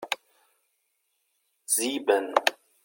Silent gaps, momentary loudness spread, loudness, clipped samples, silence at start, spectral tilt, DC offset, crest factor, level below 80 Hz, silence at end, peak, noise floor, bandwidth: none; 10 LU; -26 LUFS; under 0.1%; 0 s; 0 dB/octave; under 0.1%; 28 dB; -86 dBFS; 0.3 s; -2 dBFS; -75 dBFS; 17 kHz